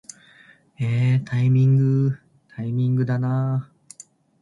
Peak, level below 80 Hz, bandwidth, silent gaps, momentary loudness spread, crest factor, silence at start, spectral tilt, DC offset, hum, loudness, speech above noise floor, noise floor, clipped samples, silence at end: -10 dBFS; -60 dBFS; 11 kHz; none; 17 LU; 12 dB; 0.8 s; -8.5 dB/octave; under 0.1%; none; -21 LUFS; 33 dB; -53 dBFS; under 0.1%; 0.75 s